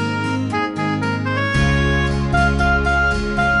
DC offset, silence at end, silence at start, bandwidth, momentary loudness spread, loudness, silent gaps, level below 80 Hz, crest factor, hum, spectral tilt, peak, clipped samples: under 0.1%; 0 s; 0 s; 11 kHz; 5 LU; -18 LUFS; none; -26 dBFS; 14 dB; none; -6 dB/octave; -4 dBFS; under 0.1%